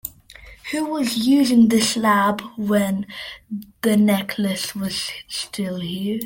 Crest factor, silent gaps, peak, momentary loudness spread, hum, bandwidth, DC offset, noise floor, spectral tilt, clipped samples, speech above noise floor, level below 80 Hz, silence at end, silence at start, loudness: 14 dB; none; -6 dBFS; 16 LU; none; 17 kHz; under 0.1%; -44 dBFS; -4.5 dB/octave; under 0.1%; 24 dB; -56 dBFS; 0 s; 0.05 s; -20 LUFS